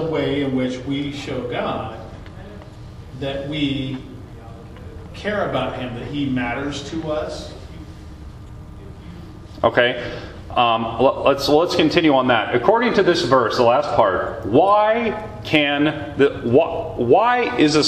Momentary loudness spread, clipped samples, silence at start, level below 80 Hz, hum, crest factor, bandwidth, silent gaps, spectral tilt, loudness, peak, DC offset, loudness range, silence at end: 22 LU; under 0.1%; 0 s; -42 dBFS; none; 20 dB; 14 kHz; none; -5.5 dB/octave; -19 LUFS; 0 dBFS; under 0.1%; 11 LU; 0 s